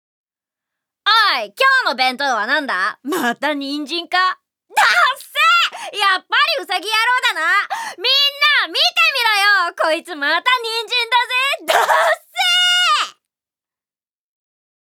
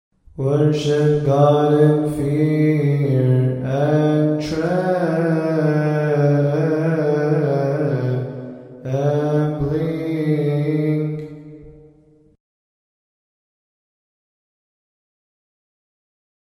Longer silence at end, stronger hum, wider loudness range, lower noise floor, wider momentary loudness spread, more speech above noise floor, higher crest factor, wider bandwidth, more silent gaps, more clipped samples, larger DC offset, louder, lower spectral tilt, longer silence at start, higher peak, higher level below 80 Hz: second, 1.8 s vs 4.7 s; neither; second, 3 LU vs 7 LU; first, under -90 dBFS vs -52 dBFS; about the same, 8 LU vs 8 LU; first, over 73 dB vs 35 dB; about the same, 18 dB vs 16 dB; first, over 20 kHz vs 10.5 kHz; neither; neither; neither; first, -15 LUFS vs -18 LUFS; second, 0.5 dB/octave vs -8.5 dB/octave; first, 1.05 s vs 0.35 s; about the same, 0 dBFS vs -2 dBFS; second, -80 dBFS vs -50 dBFS